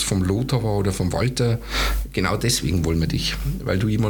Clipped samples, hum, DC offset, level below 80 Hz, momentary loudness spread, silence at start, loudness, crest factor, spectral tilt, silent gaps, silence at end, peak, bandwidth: under 0.1%; none; under 0.1%; -30 dBFS; 3 LU; 0 s; -22 LUFS; 18 dB; -5 dB/octave; none; 0 s; -4 dBFS; 19 kHz